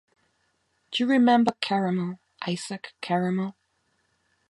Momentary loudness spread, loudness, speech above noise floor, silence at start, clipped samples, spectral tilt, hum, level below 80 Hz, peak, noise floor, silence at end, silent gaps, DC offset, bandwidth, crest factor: 15 LU; -26 LUFS; 47 dB; 0.9 s; under 0.1%; -6 dB/octave; none; -74 dBFS; -6 dBFS; -72 dBFS; 1 s; none; under 0.1%; 11.5 kHz; 20 dB